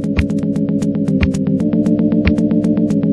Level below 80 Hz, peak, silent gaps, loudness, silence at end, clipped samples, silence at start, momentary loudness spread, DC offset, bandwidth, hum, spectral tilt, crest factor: -28 dBFS; -2 dBFS; none; -15 LUFS; 0 s; under 0.1%; 0 s; 3 LU; under 0.1%; 11 kHz; none; -8.5 dB/octave; 12 dB